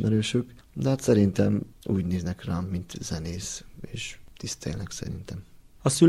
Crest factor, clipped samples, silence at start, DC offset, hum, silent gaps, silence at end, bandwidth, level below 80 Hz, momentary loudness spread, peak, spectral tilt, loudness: 20 dB; under 0.1%; 0 s; under 0.1%; none; none; 0 s; 14.5 kHz; -48 dBFS; 16 LU; -6 dBFS; -6 dB/octave; -29 LUFS